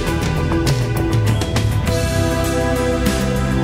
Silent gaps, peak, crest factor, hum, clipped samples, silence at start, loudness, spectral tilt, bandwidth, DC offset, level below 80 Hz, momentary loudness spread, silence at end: none; -4 dBFS; 14 dB; none; under 0.1%; 0 s; -18 LUFS; -5.5 dB/octave; 16 kHz; under 0.1%; -26 dBFS; 1 LU; 0 s